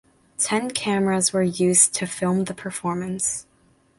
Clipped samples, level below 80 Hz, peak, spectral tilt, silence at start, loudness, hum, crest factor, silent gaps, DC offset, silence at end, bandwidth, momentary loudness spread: under 0.1%; -60 dBFS; -2 dBFS; -3.5 dB/octave; 0.4 s; -21 LUFS; none; 22 dB; none; under 0.1%; 0.55 s; 12 kHz; 12 LU